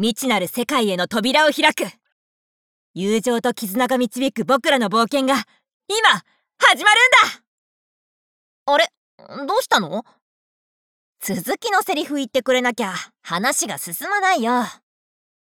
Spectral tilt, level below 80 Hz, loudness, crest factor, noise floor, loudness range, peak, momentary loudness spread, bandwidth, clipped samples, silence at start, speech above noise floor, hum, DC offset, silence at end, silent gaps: -2.5 dB/octave; -66 dBFS; -18 LUFS; 20 dB; under -90 dBFS; 7 LU; -2 dBFS; 13 LU; over 20 kHz; under 0.1%; 0 s; over 71 dB; none; under 0.1%; 0.8 s; 2.12-2.94 s, 5.74-5.80 s, 7.47-8.66 s, 8.97-9.18 s, 10.22-11.13 s